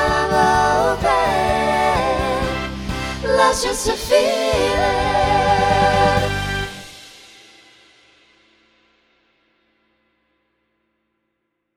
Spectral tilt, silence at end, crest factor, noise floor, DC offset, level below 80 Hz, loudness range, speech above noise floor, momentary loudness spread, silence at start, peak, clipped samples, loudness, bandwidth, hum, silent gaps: -4 dB/octave; 4.65 s; 20 dB; -74 dBFS; under 0.1%; -34 dBFS; 7 LU; 56 dB; 10 LU; 0 s; 0 dBFS; under 0.1%; -17 LUFS; 17 kHz; none; none